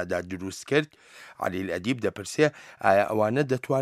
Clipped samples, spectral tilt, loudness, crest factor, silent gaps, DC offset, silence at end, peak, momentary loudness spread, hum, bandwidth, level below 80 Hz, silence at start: under 0.1%; -5.5 dB/octave; -26 LUFS; 20 dB; none; under 0.1%; 0 s; -6 dBFS; 12 LU; none; 15.5 kHz; -64 dBFS; 0 s